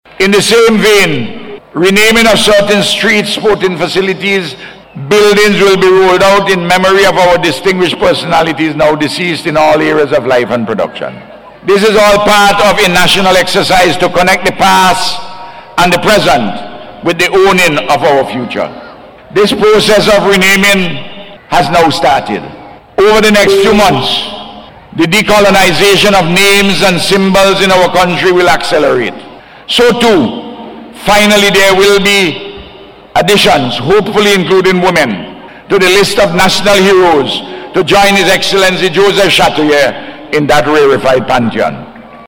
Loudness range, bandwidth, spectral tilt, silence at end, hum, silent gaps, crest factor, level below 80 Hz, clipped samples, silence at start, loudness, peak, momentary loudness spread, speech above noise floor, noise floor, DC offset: 3 LU; over 20 kHz; -3.5 dB/octave; 0.05 s; none; none; 8 dB; -34 dBFS; under 0.1%; 0.2 s; -7 LUFS; 0 dBFS; 12 LU; 25 dB; -32 dBFS; under 0.1%